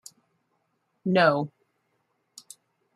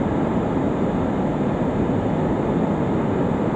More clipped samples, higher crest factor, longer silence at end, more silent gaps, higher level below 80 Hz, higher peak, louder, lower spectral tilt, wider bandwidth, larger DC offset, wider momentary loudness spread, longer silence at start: neither; first, 24 dB vs 12 dB; first, 1.5 s vs 0 s; neither; second, -76 dBFS vs -38 dBFS; about the same, -6 dBFS vs -8 dBFS; about the same, -24 LUFS vs -22 LUFS; second, -6 dB/octave vs -9 dB/octave; first, 14.5 kHz vs 8.6 kHz; neither; first, 26 LU vs 1 LU; first, 1.05 s vs 0 s